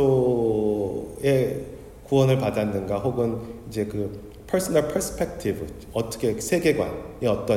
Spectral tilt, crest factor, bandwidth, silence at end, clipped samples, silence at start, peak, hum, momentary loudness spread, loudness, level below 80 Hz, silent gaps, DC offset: -6 dB/octave; 16 dB; 16 kHz; 0 s; under 0.1%; 0 s; -8 dBFS; none; 12 LU; -25 LUFS; -46 dBFS; none; under 0.1%